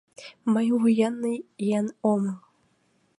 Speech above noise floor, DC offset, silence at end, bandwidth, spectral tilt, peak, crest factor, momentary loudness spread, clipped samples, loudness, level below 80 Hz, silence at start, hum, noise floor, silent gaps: 43 dB; under 0.1%; 0.8 s; 11 kHz; -7 dB/octave; -10 dBFS; 16 dB; 11 LU; under 0.1%; -25 LUFS; -76 dBFS; 0.2 s; none; -67 dBFS; none